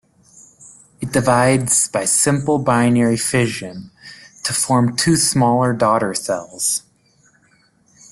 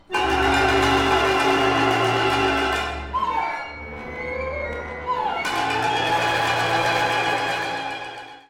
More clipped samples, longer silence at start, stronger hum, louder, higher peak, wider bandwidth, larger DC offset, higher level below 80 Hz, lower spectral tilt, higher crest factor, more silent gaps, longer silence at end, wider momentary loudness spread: neither; first, 0.6 s vs 0.1 s; neither; first, -16 LUFS vs -21 LUFS; first, -2 dBFS vs -6 dBFS; second, 12.5 kHz vs 17 kHz; neither; second, -52 dBFS vs -40 dBFS; about the same, -4 dB/octave vs -4 dB/octave; about the same, 18 dB vs 16 dB; neither; first, 1.3 s vs 0.1 s; about the same, 10 LU vs 12 LU